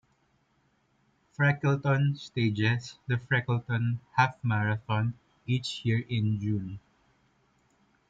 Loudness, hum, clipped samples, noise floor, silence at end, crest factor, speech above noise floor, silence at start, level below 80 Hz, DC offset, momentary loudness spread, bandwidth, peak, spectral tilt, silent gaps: -29 LUFS; none; under 0.1%; -70 dBFS; 1.3 s; 20 dB; 42 dB; 1.4 s; -64 dBFS; under 0.1%; 7 LU; 7.8 kHz; -10 dBFS; -7 dB/octave; none